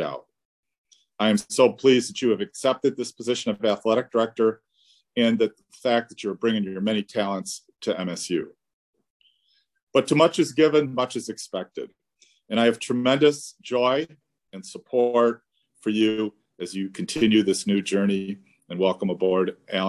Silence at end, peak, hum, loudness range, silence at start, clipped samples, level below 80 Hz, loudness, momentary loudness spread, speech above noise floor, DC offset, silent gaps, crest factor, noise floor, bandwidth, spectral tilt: 0 s; -4 dBFS; none; 4 LU; 0 s; under 0.1%; -66 dBFS; -24 LUFS; 15 LU; 45 dB; under 0.1%; 0.45-0.63 s, 0.78-0.84 s, 8.73-8.93 s, 9.10-9.20 s, 9.83-9.87 s; 20 dB; -68 dBFS; 12.5 kHz; -5 dB/octave